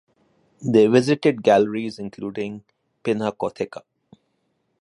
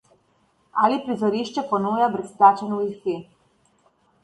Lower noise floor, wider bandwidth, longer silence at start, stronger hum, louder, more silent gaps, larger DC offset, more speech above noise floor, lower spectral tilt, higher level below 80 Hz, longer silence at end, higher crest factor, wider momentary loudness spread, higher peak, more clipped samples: first, -71 dBFS vs -64 dBFS; about the same, 11.5 kHz vs 11.5 kHz; second, 0.6 s vs 0.75 s; neither; about the same, -21 LUFS vs -22 LUFS; neither; neither; first, 51 dB vs 43 dB; about the same, -6.5 dB/octave vs -6.5 dB/octave; about the same, -64 dBFS vs -68 dBFS; about the same, 1 s vs 1 s; about the same, 20 dB vs 22 dB; first, 15 LU vs 12 LU; about the same, -2 dBFS vs -2 dBFS; neither